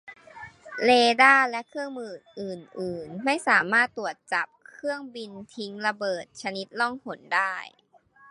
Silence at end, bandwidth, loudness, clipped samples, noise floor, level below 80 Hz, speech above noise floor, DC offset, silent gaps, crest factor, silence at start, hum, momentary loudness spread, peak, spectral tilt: 0.65 s; 11.5 kHz; -24 LUFS; under 0.1%; -46 dBFS; -70 dBFS; 20 dB; under 0.1%; none; 24 dB; 0.05 s; none; 20 LU; -2 dBFS; -3.5 dB/octave